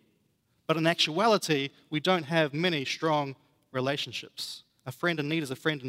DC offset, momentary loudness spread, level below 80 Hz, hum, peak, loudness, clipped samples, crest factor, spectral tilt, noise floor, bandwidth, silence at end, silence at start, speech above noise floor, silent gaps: under 0.1%; 13 LU; -76 dBFS; none; -8 dBFS; -28 LUFS; under 0.1%; 20 dB; -4.5 dB/octave; -72 dBFS; 16 kHz; 0 s; 0.7 s; 43 dB; none